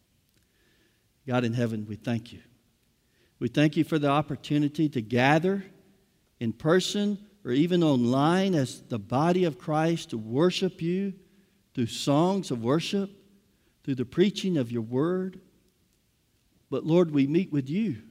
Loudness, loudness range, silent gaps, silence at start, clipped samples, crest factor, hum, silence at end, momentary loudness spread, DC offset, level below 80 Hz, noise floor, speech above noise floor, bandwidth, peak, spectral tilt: -27 LUFS; 5 LU; none; 1.25 s; under 0.1%; 20 dB; none; 0.1 s; 11 LU; under 0.1%; -66 dBFS; -69 dBFS; 43 dB; 15.5 kHz; -6 dBFS; -6.5 dB/octave